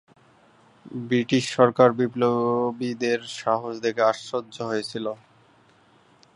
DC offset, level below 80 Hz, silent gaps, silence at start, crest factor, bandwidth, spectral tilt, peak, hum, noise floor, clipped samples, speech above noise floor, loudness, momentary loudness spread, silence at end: under 0.1%; -70 dBFS; none; 0.85 s; 22 dB; 11 kHz; -5.5 dB/octave; -2 dBFS; none; -58 dBFS; under 0.1%; 35 dB; -24 LUFS; 12 LU; 1.2 s